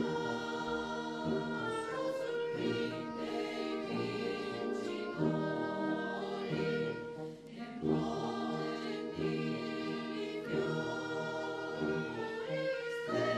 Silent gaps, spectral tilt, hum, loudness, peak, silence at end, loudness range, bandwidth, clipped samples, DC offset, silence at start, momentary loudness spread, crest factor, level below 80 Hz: none; -6 dB/octave; none; -37 LUFS; -20 dBFS; 0 s; 1 LU; 12.5 kHz; under 0.1%; under 0.1%; 0 s; 4 LU; 18 dB; -68 dBFS